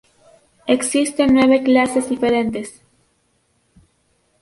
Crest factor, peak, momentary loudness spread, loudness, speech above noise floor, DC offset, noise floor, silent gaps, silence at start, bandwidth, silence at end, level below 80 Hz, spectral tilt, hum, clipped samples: 16 dB; -2 dBFS; 14 LU; -16 LUFS; 48 dB; under 0.1%; -64 dBFS; none; 0.65 s; 11.5 kHz; 1.7 s; -52 dBFS; -4 dB/octave; none; under 0.1%